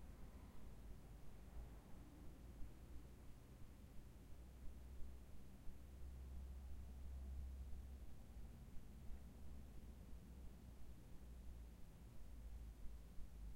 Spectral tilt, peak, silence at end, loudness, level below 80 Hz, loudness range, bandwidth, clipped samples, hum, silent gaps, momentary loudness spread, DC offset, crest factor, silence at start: -6.5 dB/octave; -38 dBFS; 0 s; -61 LUFS; -58 dBFS; 4 LU; 16 kHz; under 0.1%; none; none; 6 LU; under 0.1%; 16 dB; 0 s